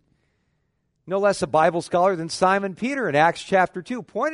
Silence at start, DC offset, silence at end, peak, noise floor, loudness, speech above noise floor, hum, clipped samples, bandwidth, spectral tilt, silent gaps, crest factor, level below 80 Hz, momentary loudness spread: 1.05 s; under 0.1%; 0 s; -4 dBFS; -71 dBFS; -22 LUFS; 50 dB; none; under 0.1%; 11 kHz; -5 dB/octave; none; 18 dB; -60 dBFS; 7 LU